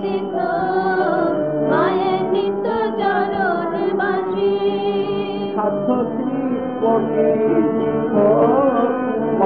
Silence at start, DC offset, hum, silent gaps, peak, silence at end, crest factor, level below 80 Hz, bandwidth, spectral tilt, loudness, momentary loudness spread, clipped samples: 0 s; 0.3%; none; none; -4 dBFS; 0 s; 14 dB; -56 dBFS; 5 kHz; -10 dB/octave; -18 LUFS; 6 LU; under 0.1%